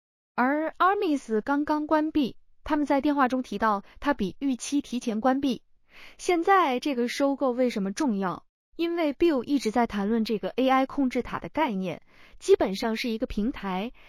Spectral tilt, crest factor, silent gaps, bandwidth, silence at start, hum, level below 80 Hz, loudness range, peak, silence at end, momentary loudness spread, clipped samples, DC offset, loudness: -5 dB/octave; 18 dB; 8.49-8.72 s; 15 kHz; 0.35 s; none; -52 dBFS; 1 LU; -8 dBFS; 0.2 s; 9 LU; under 0.1%; under 0.1%; -26 LUFS